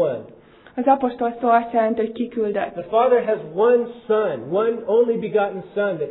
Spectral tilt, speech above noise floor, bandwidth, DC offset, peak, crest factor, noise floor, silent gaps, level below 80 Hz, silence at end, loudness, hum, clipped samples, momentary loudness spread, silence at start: -10.5 dB/octave; 27 dB; 4.1 kHz; under 0.1%; -4 dBFS; 16 dB; -47 dBFS; none; -62 dBFS; 0 s; -20 LUFS; none; under 0.1%; 7 LU; 0 s